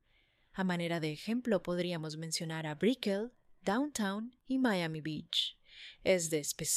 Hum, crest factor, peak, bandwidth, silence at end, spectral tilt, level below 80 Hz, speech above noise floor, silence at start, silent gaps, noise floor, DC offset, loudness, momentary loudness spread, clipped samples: none; 20 dB; -16 dBFS; 15.5 kHz; 0 s; -4 dB/octave; -68 dBFS; 37 dB; 0.55 s; none; -71 dBFS; under 0.1%; -35 LUFS; 9 LU; under 0.1%